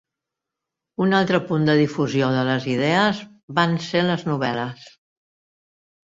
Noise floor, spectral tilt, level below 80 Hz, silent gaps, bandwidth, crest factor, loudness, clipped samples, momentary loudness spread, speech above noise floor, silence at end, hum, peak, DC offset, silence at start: -85 dBFS; -6.5 dB/octave; -62 dBFS; 3.43-3.48 s; 7.8 kHz; 20 dB; -21 LUFS; under 0.1%; 8 LU; 65 dB; 1.25 s; none; -2 dBFS; under 0.1%; 1 s